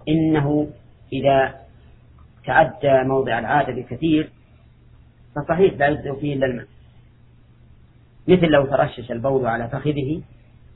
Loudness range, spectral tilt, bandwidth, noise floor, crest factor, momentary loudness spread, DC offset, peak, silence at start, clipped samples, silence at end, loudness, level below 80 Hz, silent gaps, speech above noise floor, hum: 4 LU; -11 dB/octave; 4.1 kHz; -50 dBFS; 20 dB; 13 LU; under 0.1%; -2 dBFS; 0.05 s; under 0.1%; 0.55 s; -20 LUFS; -46 dBFS; none; 31 dB; none